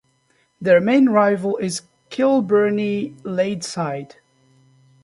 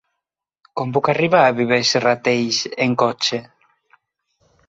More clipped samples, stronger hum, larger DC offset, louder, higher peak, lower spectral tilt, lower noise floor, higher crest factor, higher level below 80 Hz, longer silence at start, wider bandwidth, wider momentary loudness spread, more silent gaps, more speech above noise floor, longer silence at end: neither; neither; neither; about the same, -19 LUFS vs -17 LUFS; about the same, -2 dBFS vs -2 dBFS; first, -5.5 dB/octave vs -4 dB/octave; second, -63 dBFS vs -82 dBFS; about the same, 18 dB vs 18 dB; about the same, -66 dBFS vs -62 dBFS; second, 0.6 s vs 0.75 s; first, 11.5 kHz vs 8 kHz; first, 12 LU vs 8 LU; neither; second, 45 dB vs 64 dB; second, 1 s vs 1.25 s